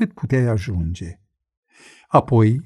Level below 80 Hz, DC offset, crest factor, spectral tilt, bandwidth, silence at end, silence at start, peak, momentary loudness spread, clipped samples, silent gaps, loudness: -40 dBFS; under 0.1%; 18 dB; -8.5 dB/octave; 10.5 kHz; 0.05 s; 0 s; -2 dBFS; 14 LU; under 0.1%; 1.57-1.63 s; -19 LUFS